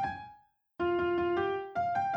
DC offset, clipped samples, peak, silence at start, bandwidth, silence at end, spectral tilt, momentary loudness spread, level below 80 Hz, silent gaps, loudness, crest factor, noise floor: under 0.1%; under 0.1%; -20 dBFS; 0 s; 6 kHz; 0 s; -7.5 dB/octave; 11 LU; -60 dBFS; none; -32 LUFS; 12 dB; -60 dBFS